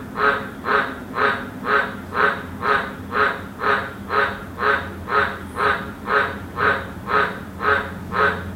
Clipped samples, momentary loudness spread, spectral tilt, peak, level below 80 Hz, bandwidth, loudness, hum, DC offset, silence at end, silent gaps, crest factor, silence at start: under 0.1%; 5 LU; -5.5 dB/octave; -4 dBFS; -46 dBFS; 16 kHz; -21 LUFS; none; under 0.1%; 0 s; none; 18 dB; 0 s